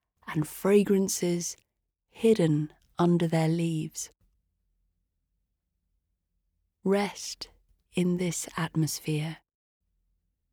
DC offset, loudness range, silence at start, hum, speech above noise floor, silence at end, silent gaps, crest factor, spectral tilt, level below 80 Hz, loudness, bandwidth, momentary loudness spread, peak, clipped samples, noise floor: under 0.1%; 9 LU; 0.25 s; none; 53 dB; 1.15 s; none; 20 dB; -5.5 dB/octave; -66 dBFS; -28 LUFS; 19 kHz; 14 LU; -10 dBFS; under 0.1%; -80 dBFS